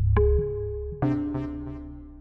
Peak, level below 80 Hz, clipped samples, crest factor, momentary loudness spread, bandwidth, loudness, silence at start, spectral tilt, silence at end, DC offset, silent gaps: -12 dBFS; -30 dBFS; under 0.1%; 14 dB; 16 LU; 3.9 kHz; -27 LUFS; 0 s; -11.5 dB/octave; 0 s; under 0.1%; none